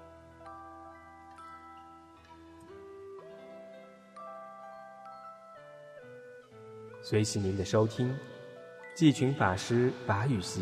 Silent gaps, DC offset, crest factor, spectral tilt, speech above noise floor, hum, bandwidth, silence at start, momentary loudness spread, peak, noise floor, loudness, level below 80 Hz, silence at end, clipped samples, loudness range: none; under 0.1%; 22 dB; -6 dB/octave; 25 dB; none; 15 kHz; 0 s; 23 LU; -12 dBFS; -54 dBFS; -30 LUFS; -66 dBFS; 0 s; under 0.1%; 20 LU